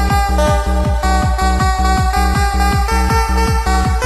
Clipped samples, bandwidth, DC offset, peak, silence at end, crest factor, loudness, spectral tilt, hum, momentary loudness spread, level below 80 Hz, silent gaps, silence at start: under 0.1%; 13.5 kHz; under 0.1%; -2 dBFS; 0 s; 12 dB; -15 LUFS; -5 dB/octave; none; 1 LU; -16 dBFS; none; 0 s